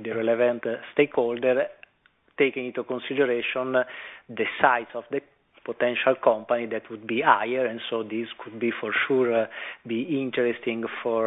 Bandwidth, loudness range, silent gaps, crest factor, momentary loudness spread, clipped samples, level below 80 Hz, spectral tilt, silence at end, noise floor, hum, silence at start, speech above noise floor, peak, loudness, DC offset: 4 kHz; 2 LU; none; 24 dB; 11 LU; under 0.1%; -72 dBFS; -8 dB/octave; 0 s; -64 dBFS; none; 0 s; 39 dB; -2 dBFS; -25 LUFS; under 0.1%